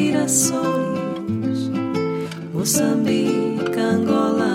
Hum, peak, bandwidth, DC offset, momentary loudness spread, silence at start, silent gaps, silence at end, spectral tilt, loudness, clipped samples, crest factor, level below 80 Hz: none; -6 dBFS; 16.5 kHz; under 0.1%; 8 LU; 0 s; none; 0 s; -4.5 dB/octave; -20 LUFS; under 0.1%; 14 dB; -62 dBFS